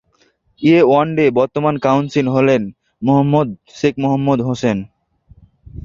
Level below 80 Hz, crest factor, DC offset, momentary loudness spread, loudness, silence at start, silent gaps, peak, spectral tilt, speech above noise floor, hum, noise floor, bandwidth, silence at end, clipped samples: -48 dBFS; 14 dB; under 0.1%; 8 LU; -15 LUFS; 0.6 s; none; -2 dBFS; -7.5 dB/octave; 44 dB; none; -58 dBFS; 7.4 kHz; 0.05 s; under 0.1%